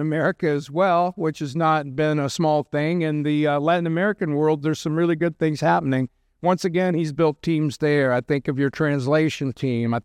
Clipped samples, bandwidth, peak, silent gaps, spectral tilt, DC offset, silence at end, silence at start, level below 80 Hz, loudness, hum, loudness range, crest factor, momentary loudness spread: under 0.1%; 13 kHz; -6 dBFS; none; -7 dB/octave; under 0.1%; 0.05 s; 0 s; -60 dBFS; -22 LUFS; none; 1 LU; 14 dB; 4 LU